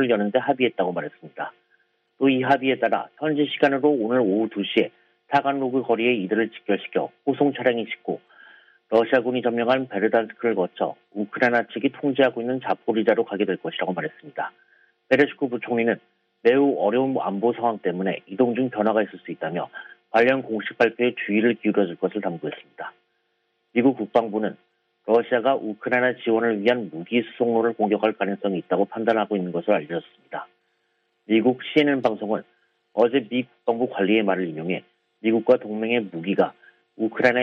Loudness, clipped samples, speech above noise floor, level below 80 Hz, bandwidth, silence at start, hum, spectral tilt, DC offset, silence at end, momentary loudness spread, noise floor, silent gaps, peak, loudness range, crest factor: -23 LUFS; under 0.1%; 49 dB; -72 dBFS; 6.6 kHz; 0 s; none; -7.5 dB/octave; under 0.1%; 0 s; 10 LU; -72 dBFS; none; -4 dBFS; 3 LU; 20 dB